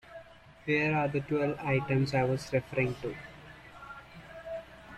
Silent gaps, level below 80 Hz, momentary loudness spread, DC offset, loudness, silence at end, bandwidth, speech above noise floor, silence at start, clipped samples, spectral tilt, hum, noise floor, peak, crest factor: none; -58 dBFS; 21 LU; under 0.1%; -31 LUFS; 0 s; 12.5 kHz; 23 dB; 0.05 s; under 0.1%; -7 dB/octave; none; -53 dBFS; -16 dBFS; 16 dB